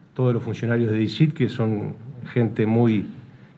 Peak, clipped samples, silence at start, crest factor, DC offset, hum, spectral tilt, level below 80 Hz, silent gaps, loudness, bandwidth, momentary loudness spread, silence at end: -6 dBFS; under 0.1%; 0.15 s; 16 dB; under 0.1%; none; -9 dB/octave; -62 dBFS; none; -22 LUFS; 7.4 kHz; 9 LU; 0.3 s